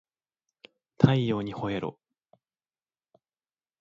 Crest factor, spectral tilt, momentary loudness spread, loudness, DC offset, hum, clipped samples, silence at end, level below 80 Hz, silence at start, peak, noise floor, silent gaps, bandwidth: 28 dB; -8.5 dB/octave; 11 LU; -27 LUFS; under 0.1%; none; under 0.1%; 1.9 s; -60 dBFS; 1 s; -4 dBFS; under -90 dBFS; none; 7.2 kHz